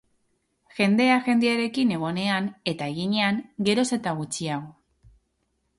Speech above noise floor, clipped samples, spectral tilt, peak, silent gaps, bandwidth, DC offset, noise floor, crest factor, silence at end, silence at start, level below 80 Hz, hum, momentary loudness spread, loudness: 49 dB; under 0.1%; -5 dB/octave; -8 dBFS; none; 11.5 kHz; under 0.1%; -73 dBFS; 18 dB; 1.1 s; 0.75 s; -64 dBFS; none; 9 LU; -24 LUFS